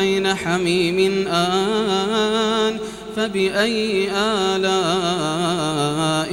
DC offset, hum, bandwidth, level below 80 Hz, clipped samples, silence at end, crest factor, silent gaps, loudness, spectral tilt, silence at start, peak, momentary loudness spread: under 0.1%; none; 16.5 kHz; -50 dBFS; under 0.1%; 0 s; 14 dB; none; -19 LUFS; -4.5 dB/octave; 0 s; -6 dBFS; 2 LU